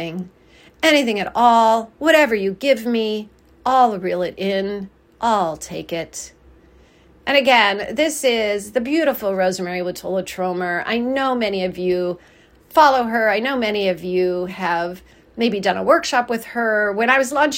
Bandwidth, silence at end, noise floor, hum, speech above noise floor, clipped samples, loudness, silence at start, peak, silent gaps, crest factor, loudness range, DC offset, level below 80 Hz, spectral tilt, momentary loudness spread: 16.5 kHz; 0 s; -50 dBFS; none; 32 dB; under 0.1%; -18 LUFS; 0 s; 0 dBFS; none; 18 dB; 4 LU; under 0.1%; -54 dBFS; -4 dB/octave; 13 LU